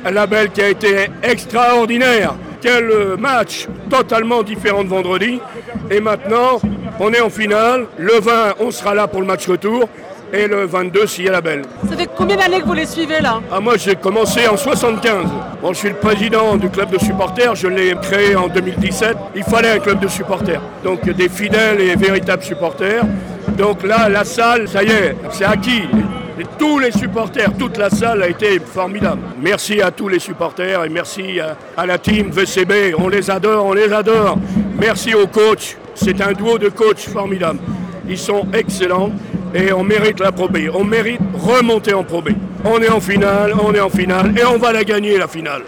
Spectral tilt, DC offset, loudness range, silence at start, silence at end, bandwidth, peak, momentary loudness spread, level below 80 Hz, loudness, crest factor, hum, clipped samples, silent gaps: -5 dB/octave; under 0.1%; 3 LU; 0 s; 0 s; over 20 kHz; -6 dBFS; 8 LU; -40 dBFS; -14 LUFS; 8 dB; none; under 0.1%; none